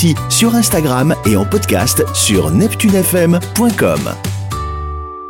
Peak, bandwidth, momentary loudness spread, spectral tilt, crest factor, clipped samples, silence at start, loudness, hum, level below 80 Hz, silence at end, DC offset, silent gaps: -2 dBFS; 17 kHz; 10 LU; -4.5 dB/octave; 12 dB; under 0.1%; 0 s; -13 LUFS; none; -32 dBFS; 0 s; under 0.1%; none